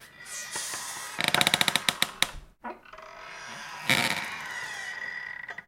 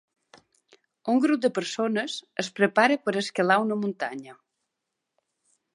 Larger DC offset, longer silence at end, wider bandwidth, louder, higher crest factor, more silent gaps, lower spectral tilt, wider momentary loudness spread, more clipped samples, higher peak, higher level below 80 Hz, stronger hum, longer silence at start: neither; second, 0.05 s vs 1.4 s; first, 17 kHz vs 11.5 kHz; second, -28 LUFS vs -25 LUFS; first, 30 dB vs 22 dB; neither; second, -1 dB/octave vs -4.5 dB/octave; first, 20 LU vs 11 LU; neither; first, -2 dBFS vs -6 dBFS; first, -58 dBFS vs -80 dBFS; neither; second, 0 s vs 1.05 s